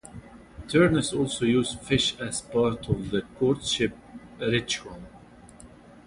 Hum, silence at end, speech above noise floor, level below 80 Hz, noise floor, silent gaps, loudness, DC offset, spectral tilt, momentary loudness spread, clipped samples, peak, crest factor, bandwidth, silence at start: none; 0.4 s; 24 dB; -48 dBFS; -50 dBFS; none; -26 LUFS; under 0.1%; -4.5 dB/octave; 23 LU; under 0.1%; -8 dBFS; 20 dB; 11.5 kHz; 0.05 s